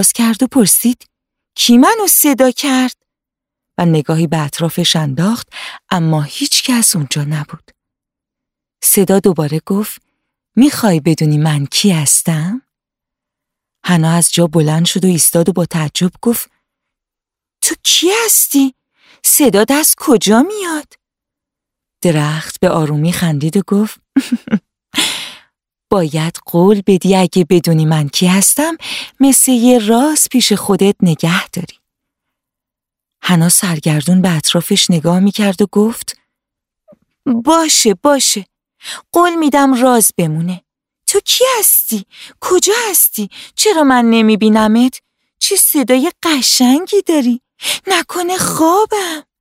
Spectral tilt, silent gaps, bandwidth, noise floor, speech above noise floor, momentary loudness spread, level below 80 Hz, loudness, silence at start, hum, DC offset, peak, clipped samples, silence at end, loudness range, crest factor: -4 dB/octave; none; 16.5 kHz; -85 dBFS; 73 dB; 11 LU; -52 dBFS; -12 LUFS; 0 s; none; under 0.1%; 0 dBFS; under 0.1%; 0.2 s; 5 LU; 14 dB